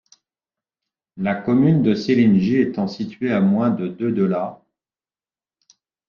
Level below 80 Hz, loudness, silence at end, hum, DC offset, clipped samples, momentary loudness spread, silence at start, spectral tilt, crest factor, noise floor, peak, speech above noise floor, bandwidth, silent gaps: -58 dBFS; -19 LUFS; 1.55 s; none; under 0.1%; under 0.1%; 10 LU; 1.15 s; -8.5 dB/octave; 16 dB; under -90 dBFS; -6 dBFS; over 72 dB; 6.8 kHz; none